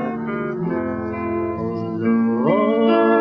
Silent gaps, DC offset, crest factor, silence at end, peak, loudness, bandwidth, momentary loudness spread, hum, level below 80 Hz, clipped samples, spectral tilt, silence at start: none; under 0.1%; 14 dB; 0 s; -4 dBFS; -20 LUFS; 5.2 kHz; 9 LU; none; -52 dBFS; under 0.1%; -9.5 dB/octave; 0 s